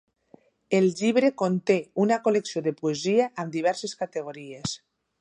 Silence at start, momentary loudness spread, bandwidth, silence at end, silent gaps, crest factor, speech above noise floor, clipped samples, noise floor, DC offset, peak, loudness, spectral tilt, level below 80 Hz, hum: 0.7 s; 11 LU; 10.5 kHz; 0.45 s; none; 18 dB; 33 dB; under 0.1%; -58 dBFS; under 0.1%; -8 dBFS; -25 LUFS; -5.5 dB/octave; -68 dBFS; none